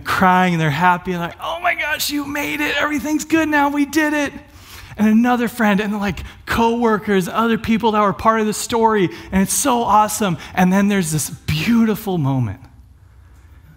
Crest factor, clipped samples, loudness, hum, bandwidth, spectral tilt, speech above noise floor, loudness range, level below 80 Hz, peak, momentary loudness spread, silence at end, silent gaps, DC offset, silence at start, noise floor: 16 dB; under 0.1%; -17 LUFS; none; 16.5 kHz; -5 dB/octave; 28 dB; 2 LU; -42 dBFS; 0 dBFS; 7 LU; 1.1 s; none; under 0.1%; 0 s; -45 dBFS